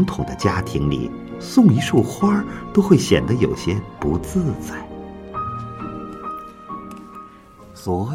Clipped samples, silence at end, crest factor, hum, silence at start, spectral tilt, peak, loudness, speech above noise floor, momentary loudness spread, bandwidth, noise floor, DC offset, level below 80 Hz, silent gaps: under 0.1%; 0 s; 20 dB; none; 0 s; -6.5 dB/octave; 0 dBFS; -20 LUFS; 25 dB; 19 LU; 16 kHz; -43 dBFS; under 0.1%; -42 dBFS; none